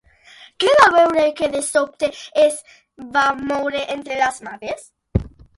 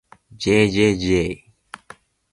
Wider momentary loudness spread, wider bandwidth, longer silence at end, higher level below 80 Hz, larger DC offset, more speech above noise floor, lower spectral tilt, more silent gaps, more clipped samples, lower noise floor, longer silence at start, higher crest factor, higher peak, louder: second, 17 LU vs 22 LU; about the same, 11.5 kHz vs 11.5 kHz; second, 0.3 s vs 0.95 s; about the same, -40 dBFS vs -42 dBFS; neither; about the same, 29 dB vs 30 dB; second, -4 dB/octave vs -5.5 dB/octave; neither; neither; about the same, -47 dBFS vs -47 dBFS; first, 0.6 s vs 0.4 s; about the same, 18 dB vs 18 dB; first, 0 dBFS vs -4 dBFS; about the same, -18 LUFS vs -19 LUFS